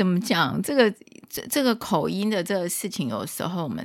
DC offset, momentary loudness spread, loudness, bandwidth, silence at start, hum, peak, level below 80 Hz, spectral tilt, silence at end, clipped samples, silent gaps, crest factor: under 0.1%; 8 LU; -24 LUFS; 17 kHz; 0 s; none; -4 dBFS; -64 dBFS; -4.5 dB/octave; 0 s; under 0.1%; none; 20 dB